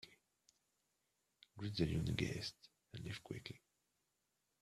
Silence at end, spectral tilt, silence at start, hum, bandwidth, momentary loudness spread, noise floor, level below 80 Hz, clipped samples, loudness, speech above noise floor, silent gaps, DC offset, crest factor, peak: 1.05 s; -5.5 dB/octave; 0.05 s; none; 14 kHz; 20 LU; -86 dBFS; -64 dBFS; under 0.1%; -44 LUFS; 43 dB; none; under 0.1%; 24 dB; -22 dBFS